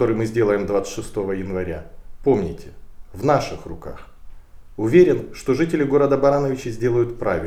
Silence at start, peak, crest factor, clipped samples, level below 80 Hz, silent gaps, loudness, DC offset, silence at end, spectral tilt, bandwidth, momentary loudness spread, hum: 0 s; -2 dBFS; 18 dB; under 0.1%; -40 dBFS; none; -20 LUFS; under 0.1%; 0 s; -7 dB/octave; 14 kHz; 17 LU; none